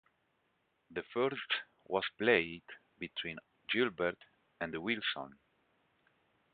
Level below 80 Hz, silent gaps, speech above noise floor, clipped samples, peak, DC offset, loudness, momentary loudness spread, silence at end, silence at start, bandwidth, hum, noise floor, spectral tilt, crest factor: -72 dBFS; none; 42 dB; under 0.1%; -14 dBFS; under 0.1%; -36 LUFS; 18 LU; 1.2 s; 0.9 s; 4.8 kHz; none; -78 dBFS; -1.5 dB/octave; 24 dB